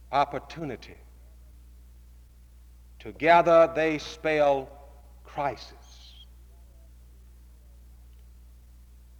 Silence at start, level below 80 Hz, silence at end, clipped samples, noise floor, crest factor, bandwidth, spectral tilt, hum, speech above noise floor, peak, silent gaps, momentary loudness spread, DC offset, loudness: 0.1 s; -50 dBFS; 3.5 s; under 0.1%; -52 dBFS; 22 dB; 14.5 kHz; -5.5 dB/octave; 60 Hz at -50 dBFS; 27 dB; -8 dBFS; none; 26 LU; under 0.1%; -24 LUFS